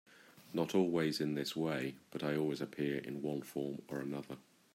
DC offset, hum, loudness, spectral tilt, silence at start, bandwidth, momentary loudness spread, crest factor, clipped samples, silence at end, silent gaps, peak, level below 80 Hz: under 0.1%; none; -38 LUFS; -6 dB/octave; 0.1 s; 16 kHz; 10 LU; 20 dB; under 0.1%; 0.35 s; none; -20 dBFS; -78 dBFS